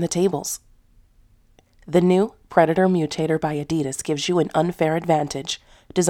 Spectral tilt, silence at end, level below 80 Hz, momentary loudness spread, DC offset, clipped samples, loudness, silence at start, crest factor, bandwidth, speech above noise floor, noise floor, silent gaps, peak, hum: -5 dB/octave; 0 s; -54 dBFS; 10 LU; under 0.1%; under 0.1%; -21 LUFS; 0 s; 20 dB; 17 kHz; 36 dB; -56 dBFS; none; -2 dBFS; none